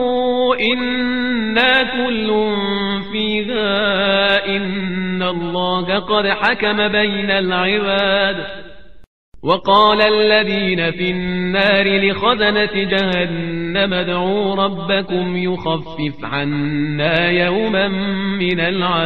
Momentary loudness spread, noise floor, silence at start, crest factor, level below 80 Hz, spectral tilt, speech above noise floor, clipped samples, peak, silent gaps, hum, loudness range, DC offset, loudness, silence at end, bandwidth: 7 LU; -39 dBFS; 0 s; 16 dB; -44 dBFS; -7.5 dB/octave; 22 dB; under 0.1%; 0 dBFS; 9.07-9.32 s; none; 3 LU; 2%; -16 LUFS; 0 s; 6 kHz